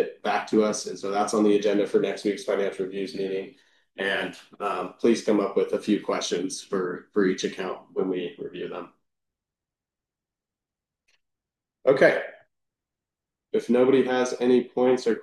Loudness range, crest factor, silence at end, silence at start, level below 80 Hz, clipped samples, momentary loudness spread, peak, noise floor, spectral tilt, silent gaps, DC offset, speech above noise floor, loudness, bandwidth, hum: 10 LU; 22 dB; 0 s; 0 s; -74 dBFS; under 0.1%; 13 LU; -4 dBFS; -89 dBFS; -4.5 dB/octave; none; under 0.1%; 65 dB; -25 LUFS; 12 kHz; none